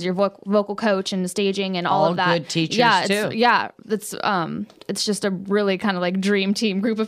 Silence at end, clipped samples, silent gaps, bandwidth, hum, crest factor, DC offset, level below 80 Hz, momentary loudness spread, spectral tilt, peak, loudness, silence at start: 0 s; under 0.1%; none; 15 kHz; none; 16 dB; under 0.1%; -68 dBFS; 7 LU; -4.5 dB/octave; -4 dBFS; -21 LUFS; 0 s